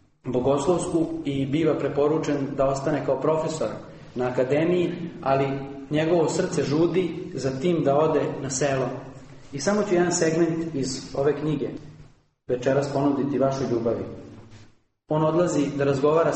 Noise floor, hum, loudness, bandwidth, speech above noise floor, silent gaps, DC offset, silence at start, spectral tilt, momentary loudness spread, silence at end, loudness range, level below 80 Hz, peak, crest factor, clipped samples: -54 dBFS; none; -24 LUFS; 8.8 kHz; 30 dB; none; under 0.1%; 0.25 s; -6 dB/octave; 8 LU; 0 s; 2 LU; -52 dBFS; -8 dBFS; 16 dB; under 0.1%